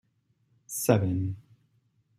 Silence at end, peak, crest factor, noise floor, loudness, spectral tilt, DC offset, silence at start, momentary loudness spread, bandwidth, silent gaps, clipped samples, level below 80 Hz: 0.8 s; -8 dBFS; 24 dB; -71 dBFS; -28 LUFS; -6 dB/octave; under 0.1%; 0.7 s; 13 LU; 16 kHz; none; under 0.1%; -66 dBFS